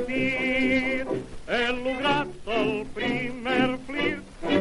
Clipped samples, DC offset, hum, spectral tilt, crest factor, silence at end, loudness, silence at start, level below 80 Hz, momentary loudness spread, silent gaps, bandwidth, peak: under 0.1%; under 0.1%; none; -5.5 dB/octave; 16 dB; 0 s; -26 LUFS; 0 s; -48 dBFS; 6 LU; none; 11.5 kHz; -10 dBFS